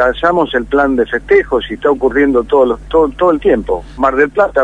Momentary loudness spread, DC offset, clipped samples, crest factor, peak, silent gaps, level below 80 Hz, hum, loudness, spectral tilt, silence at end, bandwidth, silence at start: 4 LU; 0.2%; under 0.1%; 12 dB; 0 dBFS; none; -32 dBFS; none; -13 LUFS; -6.5 dB/octave; 0 s; 9.6 kHz; 0 s